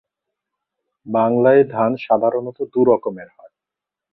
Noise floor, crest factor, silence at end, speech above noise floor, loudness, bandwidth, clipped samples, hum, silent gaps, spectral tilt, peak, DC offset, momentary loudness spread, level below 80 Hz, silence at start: -86 dBFS; 18 dB; 0.85 s; 69 dB; -17 LUFS; 4.8 kHz; under 0.1%; none; none; -11 dB/octave; -2 dBFS; under 0.1%; 11 LU; -64 dBFS; 1.05 s